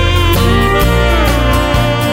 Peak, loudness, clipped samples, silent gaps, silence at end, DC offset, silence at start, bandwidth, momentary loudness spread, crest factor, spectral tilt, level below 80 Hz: 0 dBFS; -11 LUFS; under 0.1%; none; 0 s; under 0.1%; 0 s; 16.5 kHz; 2 LU; 10 dB; -5.5 dB/octave; -16 dBFS